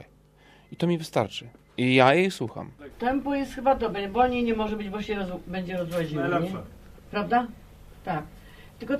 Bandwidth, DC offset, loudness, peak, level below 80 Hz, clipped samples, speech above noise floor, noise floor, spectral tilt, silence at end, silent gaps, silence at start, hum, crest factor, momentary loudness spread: 15 kHz; under 0.1%; -26 LUFS; -4 dBFS; -50 dBFS; under 0.1%; 30 dB; -56 dBFS; -6 dB/octave; 0 s; none; 0 s; none; 22 dB; 16 LU